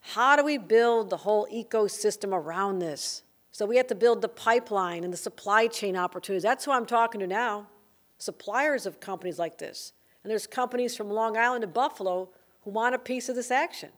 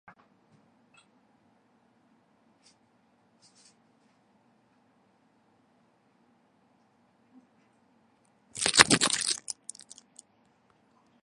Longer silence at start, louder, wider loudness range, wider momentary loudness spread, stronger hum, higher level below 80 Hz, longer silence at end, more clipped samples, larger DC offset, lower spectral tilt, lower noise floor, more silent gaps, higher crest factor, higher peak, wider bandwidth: second, 0.05 s vs 8.55 s; second, -27 LUFS vs -24 LUFS; first, 5 LU vs 1 LU; second, 13 LU vs 30 LU; neither; second, -82 dBFS vs -68 dBFS; second, 0.1 s vs 1.7 s; neither; neither; first, -3.5 dB/octave vs -1 dB/octave; second, -57 dBFS vs -67 dBFS; neither; second, 20 dB vs 36 dB; second, -8 dBFS vs 0 dBFS; first, over 20 kHz vs 16 kHz